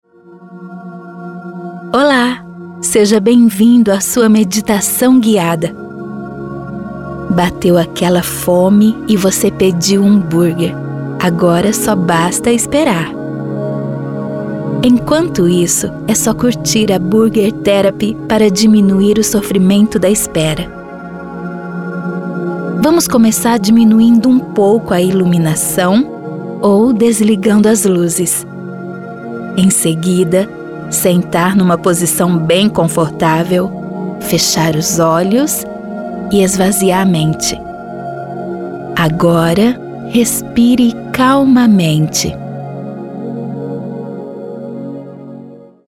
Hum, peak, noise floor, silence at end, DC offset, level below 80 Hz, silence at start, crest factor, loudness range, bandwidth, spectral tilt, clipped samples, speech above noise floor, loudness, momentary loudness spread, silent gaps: none; 0 dBFS; -38 dBFS; 0.3 s; under 0.1%; -42 dBFS; 0.3 s; 12 dB; 4 LU; 17 kHz; -5 dB/octave; under 0.1%; 28 dB; -12 LUFS; 16 LU; none